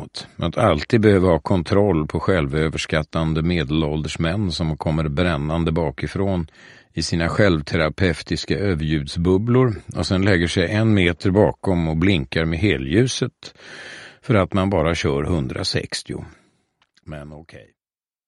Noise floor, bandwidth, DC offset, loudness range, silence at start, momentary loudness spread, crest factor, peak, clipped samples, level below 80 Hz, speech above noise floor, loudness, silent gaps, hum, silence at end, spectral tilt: under -90 dBFS; 11.5 kHz; under 0.1%; 4 LU; 0 s; 13 LU; 20 dB; -2 dBFS; under 0.1%; -36 dBFS; over 70 dB; -20 LUFS; none; none; 0.7 s; -6 dB/octave